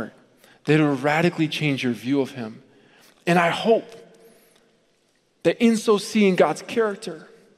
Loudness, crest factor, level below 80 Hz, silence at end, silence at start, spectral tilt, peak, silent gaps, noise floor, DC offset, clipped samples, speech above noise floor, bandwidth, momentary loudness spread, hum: -21 LUFS; 20 dB; -70 dBFS; 0.35 s; 0 s; -5.5 dB/octave; -2 dBFS; none; -65 dBFS; under 0.1%; under 0.1%; 44 dB; 15 kHz; 15 LU; none